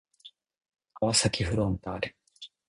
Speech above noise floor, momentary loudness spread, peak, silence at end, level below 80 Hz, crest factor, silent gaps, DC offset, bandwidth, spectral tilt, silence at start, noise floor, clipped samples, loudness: 28 dB; 18 LU; -10 dBFS; 0.2 s; -48 dBFS; 22 dB; none; under 0.1%; 11 kHz; -4 dB/octave; 0.25 s; -56 dBFS; under 0.1%; -28 LUFS